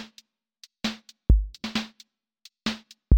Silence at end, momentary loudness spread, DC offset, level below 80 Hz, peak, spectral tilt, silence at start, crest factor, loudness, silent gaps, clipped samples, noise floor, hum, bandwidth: 0 s; 15 LU; under 0.1%; -30 dBFS; -6 dBFS; -5.5 dB/octave; 0 s; 22 dB; -29 LUFS; none; under 0.1%; -58 dBFS; none; 9 kHz